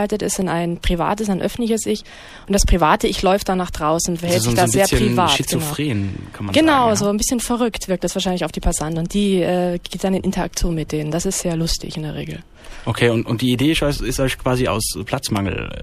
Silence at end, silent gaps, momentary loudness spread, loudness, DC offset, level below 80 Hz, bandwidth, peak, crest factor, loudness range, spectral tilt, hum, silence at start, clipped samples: 0 s; none; 9 LU; -19 LUFS; under 0.1%; -30 dBFS; 15.5 kHz; -2 dBFS; 18 dB; 4 LU; -4.5 dB/octave; none; 0 s; under 0.1%